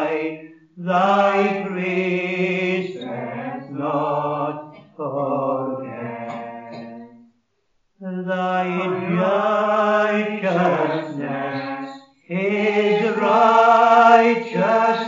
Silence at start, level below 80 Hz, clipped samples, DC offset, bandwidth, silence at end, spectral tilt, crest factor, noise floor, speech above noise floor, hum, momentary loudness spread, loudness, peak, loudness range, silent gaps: 0 s; -76 dBFS; under 0.1%; under 0.1%; 7.4 kHz; 0 s; -4.5 dB/octave; 20 dB; -69 dBFS; 49 dB; none; 18 LU; -19 LUFS; 0 dBFS; 12 LU; none